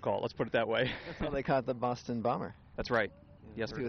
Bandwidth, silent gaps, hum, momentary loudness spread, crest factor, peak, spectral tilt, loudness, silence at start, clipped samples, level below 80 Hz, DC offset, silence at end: 6.6 kHz; none; none; 9 LU; 18 dB; -16 dBFS; -4 dB/octave; -34 LUFS; 0 s; under 0.1%; -54 dBFS; under 0.1%; 0 s